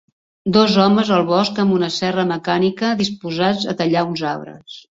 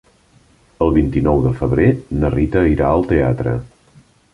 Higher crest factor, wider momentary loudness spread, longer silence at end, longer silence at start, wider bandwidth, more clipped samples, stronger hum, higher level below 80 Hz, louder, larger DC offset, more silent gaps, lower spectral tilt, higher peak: about the same, 16 dB vs 16 dB; first, 10 LU vs 5 LU; second, 0.15 s vs 0.65 s; second, 0.45 s vs 0.8 s; second, 7.8 kHz vs 10.5 kHz; neither; neither; second, -56 dBFS vs -28 dBFS; about the same, -17 LUFS vs -16 LUFS; neither; neither; second, -6 dB/octave vs -10 dB/octave; about the same, -2 dBFS vs -2 dBFS